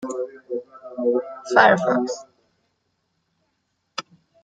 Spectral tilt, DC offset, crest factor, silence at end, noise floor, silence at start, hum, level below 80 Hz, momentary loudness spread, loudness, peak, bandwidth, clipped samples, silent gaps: -4.5 dB/octave; under 0.1%; 22 dB; 0.45 s; -73 dBFS; 0 s; none; -70 dBFS; 19 LU; -21 LUFS; -2 dBFS; 9.2 kHz; under 0.1%; none